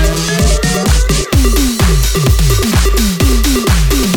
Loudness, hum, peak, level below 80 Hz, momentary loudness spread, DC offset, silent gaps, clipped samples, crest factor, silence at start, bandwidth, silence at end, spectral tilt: -12 LUFS; none; 0 dBFS; -12 dBFS; 1 LU; under 0.1%; none; under 0.1%; 10 dB; 0 s; 19 kHz; 0 s; -4.5 dB/octave